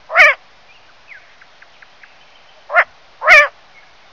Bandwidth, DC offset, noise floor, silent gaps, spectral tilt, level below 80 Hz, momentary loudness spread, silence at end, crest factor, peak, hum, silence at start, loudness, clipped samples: 6 kHz; 0.4%; -47 dBFS; none; 0.5 dB/octave; -52 dBFS; 13 LU; 0.65 s; 16 dB; 0 dBFS; none; 0.1 s; -11 LUFS; 0.2%